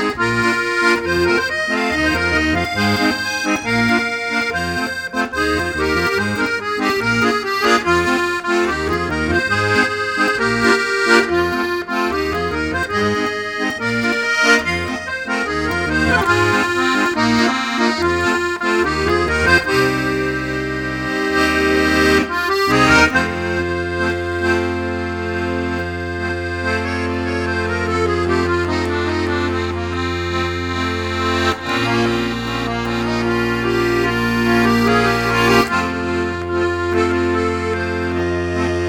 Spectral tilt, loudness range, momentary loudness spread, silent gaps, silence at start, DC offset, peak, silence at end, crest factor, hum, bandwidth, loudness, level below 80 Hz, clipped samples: -5 dB/octave; 4 LU; 7 LU; none; 0 s; under 0.1%; 0 dBFS; 0 s; 18 dB; none; 17.5 kHz; -17 LUFS; -36 dBFS; under 0.1%